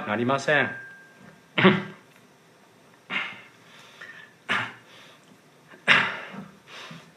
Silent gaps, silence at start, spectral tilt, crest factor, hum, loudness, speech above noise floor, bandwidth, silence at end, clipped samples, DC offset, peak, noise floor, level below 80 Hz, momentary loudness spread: none; 0 s; -5 dB/octave; 28 dB; none; -24 LUFS; 34 dB; 13 kHz; 0.15 s; under 0.1%; under 0.1%; 0 dBFS; -56 dBFS; -74 dBFS; 23 LU